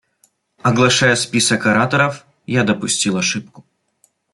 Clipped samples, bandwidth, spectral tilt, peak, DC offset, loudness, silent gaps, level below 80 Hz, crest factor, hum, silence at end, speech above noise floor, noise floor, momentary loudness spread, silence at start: under 0.1%; 12 kHz; -3.5 dB/octave; -2 dBFS; under 0.1%; -16 LUFS; none; -56 dBFS; 16 dB; none; 0.75 s; 45 dB; -61 dBFS; 8 LU; 0.65 s